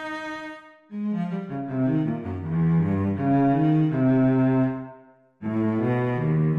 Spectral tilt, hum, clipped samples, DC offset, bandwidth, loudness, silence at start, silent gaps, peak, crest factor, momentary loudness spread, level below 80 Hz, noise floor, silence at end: -10 dB/octave; none; under 0.1%; under 0.1%; 6.2 kHz; -24 LUFS; 0 s; none; -12 dBFS; 12 dB; 15 LU; -52 dBFS; -51 dBFS; 0 s